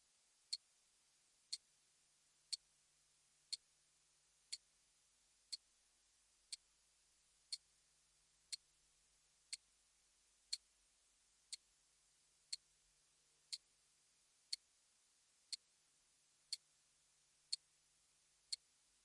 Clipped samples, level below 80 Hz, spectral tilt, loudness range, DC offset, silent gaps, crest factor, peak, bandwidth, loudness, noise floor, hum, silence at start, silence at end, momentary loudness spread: under 0.1%; under -90 dBFS; 4 dB/octave; 3 LU; under 0.1%; none; 34 dB; -26 dBFS; 12 kHz; -52 LUFS; -78 dBFS; none; 0.5 s; 0.5 s; 5 LU